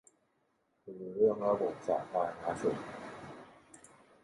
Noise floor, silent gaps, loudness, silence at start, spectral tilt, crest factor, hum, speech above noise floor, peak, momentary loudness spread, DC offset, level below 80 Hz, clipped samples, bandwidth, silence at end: -76 dBFS; none; -34 LUFS; 0.85 s; -6.5 dB/octave; 20 dB; none; 43 dB; -16 dBFS; 21 LU; under 0.1%; -72 dBFS; under 0.1%; 11.5 kHz; 0.45 s